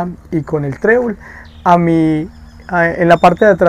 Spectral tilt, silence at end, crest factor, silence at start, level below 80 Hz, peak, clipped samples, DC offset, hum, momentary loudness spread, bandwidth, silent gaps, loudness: -7.5 dB/octave; 0 s; 12 dB; 0 s; -40 dBFS; 0 dBFS; 0.2%; under 0.1%; none; 12 LU; 11 kHz; none; -13 LUFS